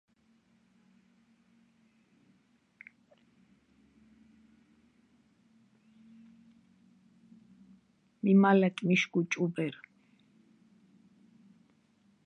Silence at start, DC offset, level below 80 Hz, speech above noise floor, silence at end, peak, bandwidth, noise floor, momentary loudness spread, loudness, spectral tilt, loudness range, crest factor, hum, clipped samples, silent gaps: 8.25 s; under 0.1%; -84 dBFS; 42 dB; 2.55 s; -12 dBFS; 7 kHz; -69 dBFS; 31 LU; -28 LUFS; -6.5 dB/octave; 6 LU; 24 dB; none; under 0.1%; none